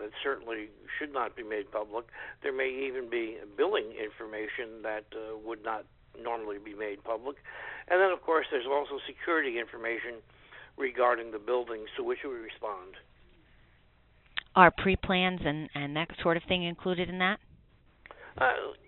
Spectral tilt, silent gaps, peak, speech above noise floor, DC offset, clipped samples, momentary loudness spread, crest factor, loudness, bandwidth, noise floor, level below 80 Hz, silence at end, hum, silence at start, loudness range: -3 dB/octave; none; -4 dBFS; 31 dB; under 0.1%; under 0.1%; 13 LU; 28 dB; -31 LUFS; 4.2 kHz; -63 dBFS; -56 dBFS; 0.1 s; none; 0 s; 10 LU